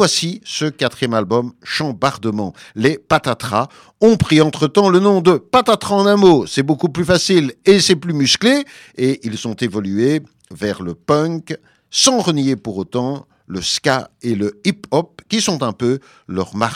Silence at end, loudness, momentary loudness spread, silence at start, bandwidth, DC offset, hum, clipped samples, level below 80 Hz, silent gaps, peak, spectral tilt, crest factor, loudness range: 0 s; -16 LUFS; 11 LU; 0 s; 15.5 kHz; under 0.1%; none; under 0.1%; -48 dBFS; none; 0 dBFS; -4.5 dB/octave; 16 dB; 6 LU